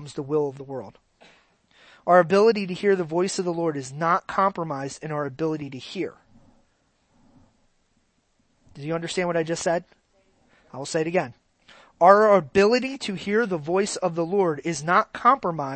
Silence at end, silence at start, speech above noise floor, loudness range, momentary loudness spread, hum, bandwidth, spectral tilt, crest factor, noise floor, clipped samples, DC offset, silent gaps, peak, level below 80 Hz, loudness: 0 s; 0 s; 45 dB; 13 LU; 14 LU; none; 8.8 kHz; -5 dB/octave; 24 dB; -68 dBFS; under 0.1%; under 0.1%; none; 0 dBFS; -64 dBFS; -23 LUFS